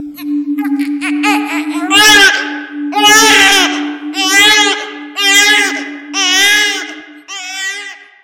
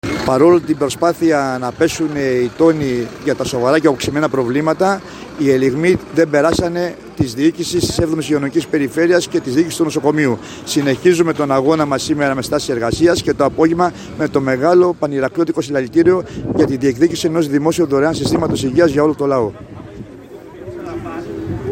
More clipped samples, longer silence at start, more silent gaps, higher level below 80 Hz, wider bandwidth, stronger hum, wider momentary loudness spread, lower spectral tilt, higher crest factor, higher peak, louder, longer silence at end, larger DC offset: first, 0.6% vs under 0.1%; about the same, 0 s vs 0.05 s; neither; second, -50 dBFS vs -44 dBFS; first, over 20 kHz vs 16.5 kHz; neither; first, 16 LU vs 10 LU; second, 0.5 dB/octave vs -5.5 dB/octave; about the same, 12 dB vs 14 dB; about the same, 0 dBFS vs 0 dBFS; first, -9 LUFS vs -15 LUFS; first, 0.2 s vs 0 s; neither